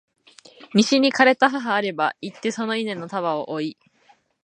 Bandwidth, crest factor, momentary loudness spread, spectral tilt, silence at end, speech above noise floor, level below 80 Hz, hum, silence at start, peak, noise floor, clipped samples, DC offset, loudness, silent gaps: 10 kHz; 22 dB; 12 LU; -4 dB/octave; 0.75 s; 38 dB; -74 dBFS; none; 0.6 s; -2 dBFS; -59 dBFS; under 0.1%; under 0.1%; -21 LUFS; none